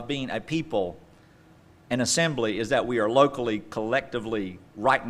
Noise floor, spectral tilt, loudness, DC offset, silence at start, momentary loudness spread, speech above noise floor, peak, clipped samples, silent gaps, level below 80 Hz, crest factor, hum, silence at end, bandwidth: -54 dBFS; -4 dB/octave; -26 LUFS; under 0.1%; 0 s; 10 LU; 29 dB; -4 dBFS; under 0.1%; none; -56 dBFS; 22 dB; none; 0 s; 14.5 kHz